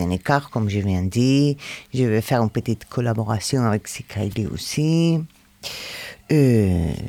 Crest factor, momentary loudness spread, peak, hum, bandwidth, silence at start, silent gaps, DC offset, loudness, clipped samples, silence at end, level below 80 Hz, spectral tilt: 16 dB; 13 LU; -4 dBFS; none; 17.5 kHz; 0 s; none; under 0.1%; -21 LUFS; under 0.1%; 0 s; -48 dBFS; -6.5 dB/octave